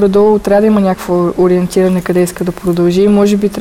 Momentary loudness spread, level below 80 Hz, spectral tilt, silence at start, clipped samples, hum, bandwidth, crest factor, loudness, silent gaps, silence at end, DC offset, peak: 5 LU; -38 dBFS; -7 dB/octave; 0 s; under 0.1%; none; 16 kHz; 8 dB; -11 LUFS; none; 0 s; under 0.1%; -2 dBFS